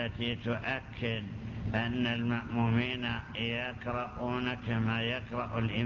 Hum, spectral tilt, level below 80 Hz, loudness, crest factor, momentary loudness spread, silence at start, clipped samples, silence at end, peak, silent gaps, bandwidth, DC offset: none; -7.5 dB/octave; -50 dBFS; -34 LUFS; 16 dB; 5 LU; 0 s; under 0.1%; 0 s; -18 dBFS; none; 7 kHz; under 0.1%